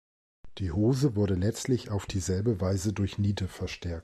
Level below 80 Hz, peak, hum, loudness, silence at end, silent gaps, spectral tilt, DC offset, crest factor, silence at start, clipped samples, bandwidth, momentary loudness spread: -48 dBFS; -14 dBFS; none; -29 LUFS; 0 s; none; -6.5 dB/octave; under 0.1%; 14 dB; 0.45 s; under 0.1%; 13 kHz; 8 LU